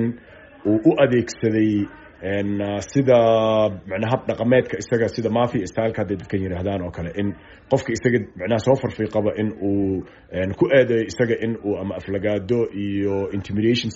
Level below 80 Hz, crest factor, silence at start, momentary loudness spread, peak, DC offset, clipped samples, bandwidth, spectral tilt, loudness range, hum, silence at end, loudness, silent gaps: -50 dBFS; 18 dB; 0 s; 10 LU; -2 dBFS; under 0.1%; under 0.1%; 8 kHz; -6 dB/octave; 4 LU; none; 0 s; -21 LUFS; none